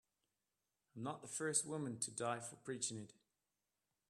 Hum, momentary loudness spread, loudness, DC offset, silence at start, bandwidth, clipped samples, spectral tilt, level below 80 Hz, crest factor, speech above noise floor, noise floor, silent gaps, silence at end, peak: 50 Hz at -85 dBFS; 13 LU; -43 LUFS; under 0.1%; 0.95 s; 14 kHz; under 0.1%; -3 dB/octave; -86 dBFS; 26 dB; over 46 dB; under -90 dBFS; none; 1 s; -22 dBFS